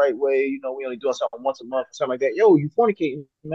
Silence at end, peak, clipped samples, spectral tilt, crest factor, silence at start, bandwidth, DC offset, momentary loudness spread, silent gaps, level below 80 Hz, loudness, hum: 0 s; -6 dBFS; under 0.1%; -6.5 dB/octave; 16 dB; 0 s; 7.6 kHz; under 0.1%; 11 LU; none; -72 dBFS; -22 LUFS; none